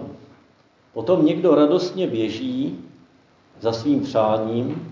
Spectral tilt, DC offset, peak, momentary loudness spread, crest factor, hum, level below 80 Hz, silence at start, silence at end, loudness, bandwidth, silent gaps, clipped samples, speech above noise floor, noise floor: -7.5 dB/octave; under 0.1%; -4 dBFS; 13 LU; 18 dB; none; -60 dBFS; 0 s; 0 s; -21 LUFS; 7.6 kHz; none; under 0.1%; 37 dB; -57 dBFS